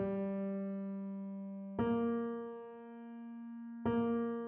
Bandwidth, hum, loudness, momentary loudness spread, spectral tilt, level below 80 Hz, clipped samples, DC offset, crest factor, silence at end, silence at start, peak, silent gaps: 3.4 kHz; none; -39 LUFS; 15 LU; -8 dB/octave; -68 dBFS; under 0.1%; under 0.1%; 16 dB; 0 s; 0 s; -24 dBFS; none